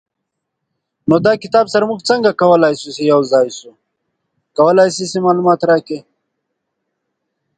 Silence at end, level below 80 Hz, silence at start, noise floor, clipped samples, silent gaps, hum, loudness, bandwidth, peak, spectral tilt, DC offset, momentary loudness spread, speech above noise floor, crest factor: 1.55 s; -60 dBFS; 1.05 s; -76 dBFS; under 0.1%; none; none; -13 LUFS; 9.4 kHz; 0 dBFS; -5.5 dB/octave; under 0.1%; 11 LU; 63 dB; 16 dB